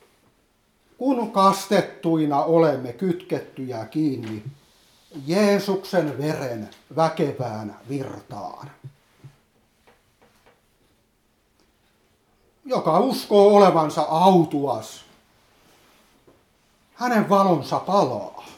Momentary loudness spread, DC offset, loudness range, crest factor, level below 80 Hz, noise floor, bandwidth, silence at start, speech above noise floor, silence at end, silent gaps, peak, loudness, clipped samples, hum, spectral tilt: 18 LU; under 0.1%; 13 LU; 22 dB; -68 dBFS; -65 dBFS; 17 kHz; 1 s; 44 dB; 0.05 s; none; -2 dBFS; -21 LUFS; under 0.1%; none; -6.5 dB/octave